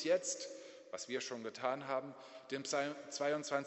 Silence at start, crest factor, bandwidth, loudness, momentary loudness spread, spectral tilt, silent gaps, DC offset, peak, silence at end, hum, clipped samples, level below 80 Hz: 0 s; 18 dB; 8.2 kHz; -40 LUFS; 13 LU; -2.5 dB/octave; none; under 0.1%; -22 dBFS; 0 s; none; under 0.1%; -88 dBFS